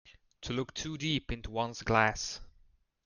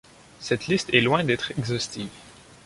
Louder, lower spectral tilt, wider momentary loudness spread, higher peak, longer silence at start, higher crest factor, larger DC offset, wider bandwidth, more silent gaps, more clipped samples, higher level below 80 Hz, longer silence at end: second, -33 LUFS vs -24 LUFS; about the same, -4 dB/octave vs -4.5 dB/octave; second, 11 LU vs 16 LU; second, -12 dBFS vs -2 dBFS; second, 0.05 s vs 0.4 s; about the same, 24 dB vs 24 dB; neither; about the same, 10.5 kHz vs 11.5 kHz; neither; neither; first, -50 dBFS vs -56 dBFS; first, 0.55 s vs 0.35 s